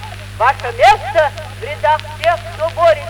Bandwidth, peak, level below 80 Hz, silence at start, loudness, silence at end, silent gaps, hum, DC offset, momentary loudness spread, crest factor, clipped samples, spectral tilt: 18.5 kHz; 0 dBFS; -38 dBFS; 0 s; -15 LUFS; 0 s; none; 50 Hz at -30 dBFS; under 0.1%; 12 LU; 14 dB; under 0.1%; -4 dB/octave